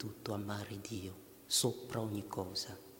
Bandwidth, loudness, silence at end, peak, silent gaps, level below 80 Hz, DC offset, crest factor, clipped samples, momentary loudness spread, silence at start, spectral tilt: 17 kHz; -39 LUFS; 0 s; -20 dBFS; none; -70 dBFS; under 0.1%; 20 dB; under 0.1%; 12 LU; 0 s; -3.5 dB/octave